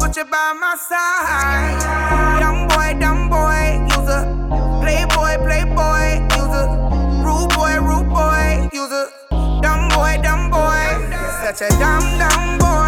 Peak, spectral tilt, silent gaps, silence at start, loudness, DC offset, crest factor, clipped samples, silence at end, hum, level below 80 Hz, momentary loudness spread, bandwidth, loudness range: 0 dBFS; -4.5 dB/octave; none; 0 s; -16 LUFS; under 0.1%; 14 dB; under 0.1%; 0 s; none; -18 dBFS; 5 LU; 17 kHz; 1 LU